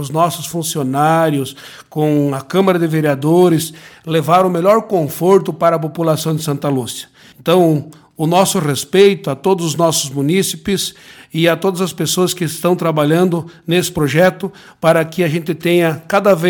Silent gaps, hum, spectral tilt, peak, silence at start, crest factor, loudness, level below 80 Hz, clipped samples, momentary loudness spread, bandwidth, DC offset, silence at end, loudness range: none; none; -5 dB/octave; 0 dBFS; 0 s; 14 dB; -15 LUFS; -54 dBFS; under 0.1%; 8 LU; 17.5 kHz; under 0.1%; 0 s; 2 LU